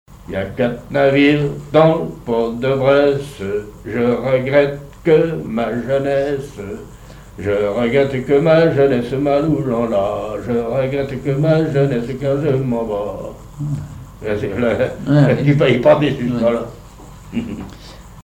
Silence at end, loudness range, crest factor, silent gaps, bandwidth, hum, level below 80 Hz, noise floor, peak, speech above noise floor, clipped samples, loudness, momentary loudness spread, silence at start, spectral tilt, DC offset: 0.05 s; 3 LU; 16 dB; none; 15.5 kHz; none; -42 dBFS; -37 dBFS; 0 dBFS; 21 dB; under 0.1%; -17 LUFS; 14 LU; 0.1 s; -8 dB/octave; under 0.1%